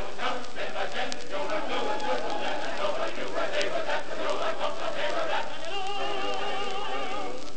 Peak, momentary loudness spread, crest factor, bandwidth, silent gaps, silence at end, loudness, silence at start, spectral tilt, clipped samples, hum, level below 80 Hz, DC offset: -8 dBFS; 4 LU; 24 dB; 8.8 kHz; none; 0 s; -31 LUFS; 0 s; -3 dB/octave; under 0.1%; none; -60 dBFS; 6%